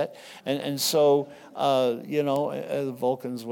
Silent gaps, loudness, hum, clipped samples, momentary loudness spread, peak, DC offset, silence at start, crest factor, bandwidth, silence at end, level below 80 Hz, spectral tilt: none; -26 LUFS; none; under 0.1%; 10 LU; -12 dBFS; under 0.1%; 0 s; 14 dB; 18 kHz; 0 s; -80 dBFS; -4.5 dB/octave